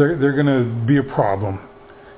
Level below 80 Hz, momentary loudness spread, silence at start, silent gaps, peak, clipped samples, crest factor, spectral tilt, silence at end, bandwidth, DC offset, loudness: -46 dBFS; 9 LU; 0 s; none; -4 dBFS; under 0.1%; 14 dB; -12 dB/octave; 0.05 s; 4 kHz; under 0.1%; -18 LUFS